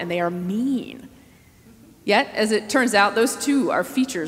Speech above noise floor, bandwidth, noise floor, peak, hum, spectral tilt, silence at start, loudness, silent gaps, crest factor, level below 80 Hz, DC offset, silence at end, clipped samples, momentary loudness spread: 30 dB; 16 kHz; -51 dBFS; -2 dBFS; none; -4 dB/octave; 0 s; -21 LUFS; none; 20 dB; -60 dBFS; under 0.1%; 0 s; under 0.1%; 10 LU